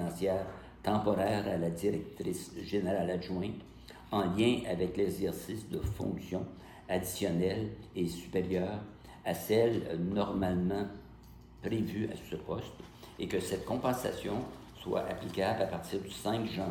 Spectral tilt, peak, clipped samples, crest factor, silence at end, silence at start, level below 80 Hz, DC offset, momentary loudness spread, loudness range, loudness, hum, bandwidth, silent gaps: -6 dB/octave; -16 dBFS; under 0.1%; 18 dB; 0 s; 0 s; -56 dBFS; under 0.1%; 12 LU; 3 LU; -35 LUFS; none; 17.5 kHz; none